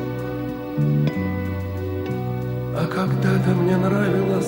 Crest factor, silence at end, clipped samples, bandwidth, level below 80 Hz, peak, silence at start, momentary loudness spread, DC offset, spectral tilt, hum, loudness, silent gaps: 14 dB; 0 s; under 0.1%; 16.5 kHz; -46 dBFS; -6 dBFS; 0 s; 8 LU; under 0.1%; -8 dB/octave; none; -22 LUFS; none